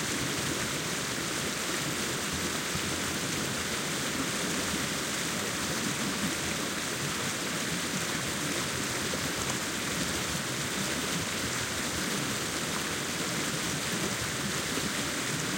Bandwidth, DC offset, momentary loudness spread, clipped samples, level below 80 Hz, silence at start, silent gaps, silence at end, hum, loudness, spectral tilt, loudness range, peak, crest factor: 16.5 kHz; under 0.1%; 1 LU; under 0.1%; -56 dBFS; 0 s; none; 0 s; none; -30 LUFS; -2.5 dB/octave; 0 LU; -16 dBFS; 16 dB